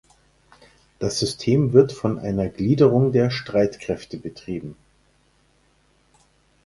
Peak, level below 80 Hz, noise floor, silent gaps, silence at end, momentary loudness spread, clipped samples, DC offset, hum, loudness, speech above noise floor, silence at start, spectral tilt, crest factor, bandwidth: -2 dBFS; -50 dBFS; -61 dBFS; none; 1.9 s; 16 LU; under 0.1%; under 0.1%; 60 Hz at -45 dBFS; -21 LUFS; 41 dB; 1 s; -6.5 dB/octave; 22 dB; 11.5 kHz